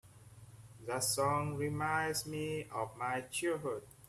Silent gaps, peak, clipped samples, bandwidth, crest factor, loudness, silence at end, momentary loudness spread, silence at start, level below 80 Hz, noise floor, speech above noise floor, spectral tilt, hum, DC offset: none; -20 dBFS; under 0.1%; 15.5 kHz; 18 dB; -36 LUFS; 0 s; 14 LU; 0.05 s; -66 dBFS; -57 dBFS; 20 dB; -4 dB/octave; none; under 0.1%